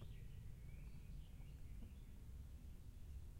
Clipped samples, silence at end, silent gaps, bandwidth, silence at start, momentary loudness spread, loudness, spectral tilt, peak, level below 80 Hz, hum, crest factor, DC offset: under 0.1%; 0 s; none; 16 kHz; 0 s; 2 LU; -59 LUFS; -6.5 dB/octave; -42 dBFS; -56 dBFS; none; 12 dB; under 0.1%